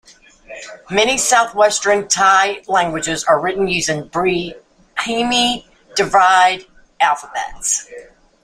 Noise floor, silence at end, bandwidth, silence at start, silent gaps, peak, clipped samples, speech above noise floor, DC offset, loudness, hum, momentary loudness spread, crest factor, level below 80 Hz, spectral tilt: -42 dBFS; 0.4 s; 15.5 kHz; 0.5 s; none; 0 dBFS; under 0.1%; 26 dB; under 0.1%; -16 LUFS; none; 14 LU; 16 dB; -48 dBFS; -2 dB/octave